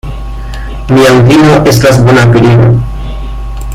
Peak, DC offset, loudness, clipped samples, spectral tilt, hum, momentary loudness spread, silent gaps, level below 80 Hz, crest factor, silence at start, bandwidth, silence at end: 0 dBFS; under 0.1%; -5 LUFS; 2%; -6.5 dB/octave; none; 17 LU; none; -20 dBFS; 6 dB; 0.05 s; 15.5 kHz; 0 s